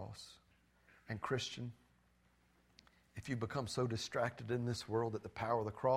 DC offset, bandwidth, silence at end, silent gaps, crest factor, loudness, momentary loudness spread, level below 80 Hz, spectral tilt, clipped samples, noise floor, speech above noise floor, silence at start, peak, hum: under 0.1%; 14.5 kHz; 0 s; none; 20 dB; -41 LUFS; 13 LU; -68 dBFS; -5.5 dB/octave; under 0.1%; -73 dBFS; 34 dB; 0 s; -22 dBFS; none